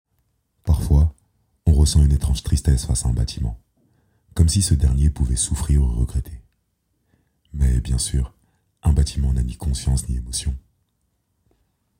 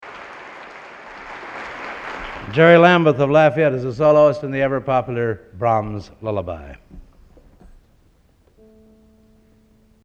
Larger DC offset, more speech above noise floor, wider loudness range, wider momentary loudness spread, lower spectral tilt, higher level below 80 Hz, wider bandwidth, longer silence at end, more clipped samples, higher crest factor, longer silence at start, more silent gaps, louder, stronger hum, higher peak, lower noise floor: neither; first, 51 dB vs 40 dB; second, 5 LU vs 13 LU; second, 12 LU vs 24 LU; second, -5.5 dB/octave vs -7.5 dB/octave; first, -24 dBFS vs -48 dBFS; first, 16 kHz vs 8 kHz; second, 1.4 s vs 3 s; neither; about the same, 18 dB vs 20 dB; first, 0.65 s vs 0.05 s; neither; second, -21 LUFS vs -17 LUFS; neither; about the same, -2 dBFS vs 0 dBFS; first, -70 dBFS vs -56 dBFS